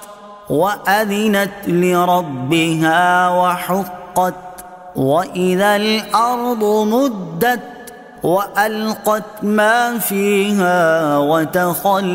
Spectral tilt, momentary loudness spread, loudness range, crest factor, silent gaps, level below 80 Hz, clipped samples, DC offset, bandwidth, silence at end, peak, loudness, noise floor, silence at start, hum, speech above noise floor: -5 dB/octave; 8 LU; 2 LU; 14 dB; none; -56 dBFS; under 0.1%; under 0.1%; 16.5 kHz; 0 s; -2 dBFS; -16 LUFS; -36 dBFS; 0 s; none; 20 dB